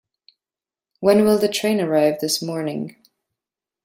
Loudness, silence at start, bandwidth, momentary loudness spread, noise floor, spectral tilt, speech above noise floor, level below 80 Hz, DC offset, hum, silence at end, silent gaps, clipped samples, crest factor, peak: -19 LUFS; 1 s; 16.5 kHz; 12 LU; under -90 dBFS; -4.5 dB/octave; over 71 dB; -62 dBFS; under 0.1%; none; 0.95 s; none; under 0.1%; 20 dB; -2 dBFS